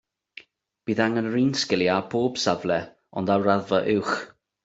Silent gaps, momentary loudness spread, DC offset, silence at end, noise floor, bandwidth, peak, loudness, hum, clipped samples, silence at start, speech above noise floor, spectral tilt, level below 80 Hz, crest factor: none; 8 LU; under 0.1%; 0.35 s; -49 dBFS; 8 kHz; -6 dBFS; -24 LUFS; none; under 0.1%; 0.85 s; 26 dB; -5 dB/octave; -64 dBFS; 20 dB